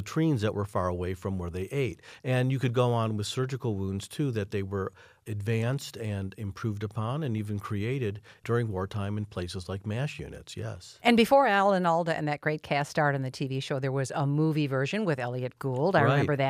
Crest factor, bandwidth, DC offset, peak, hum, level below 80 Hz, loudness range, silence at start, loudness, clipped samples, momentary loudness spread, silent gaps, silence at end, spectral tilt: 20 dB; 15.5 kHz; under 0.1%; -8 dBFS; none; -58 dBFS; 7 LU; 0 s; -29 LUFS; under 0.1%; 12 LU; none; 0 s; -6.5 dB/octave